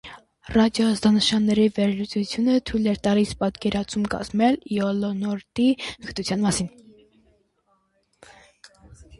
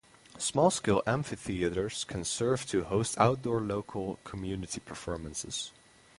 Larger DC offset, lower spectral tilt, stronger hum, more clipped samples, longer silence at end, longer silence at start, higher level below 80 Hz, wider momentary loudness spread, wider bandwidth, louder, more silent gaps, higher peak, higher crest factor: neither; about the same, -5 dB/octave vs -4.5 dB/octave; neither; neither; second, 0.05 s vs 0.5 s; second, 0.05 s vs 0.35 s; about the same, -50 dBFS vs -54 dBFS; second, 8 LU vs 12 LU; about the same, 11.5 kHz vs 11.5 kHz; first, -23 LUFS vs -32 LUFS; neither; about the same, -6 dBFS vs -8 dBFS; second, 16 dB vs 22 dB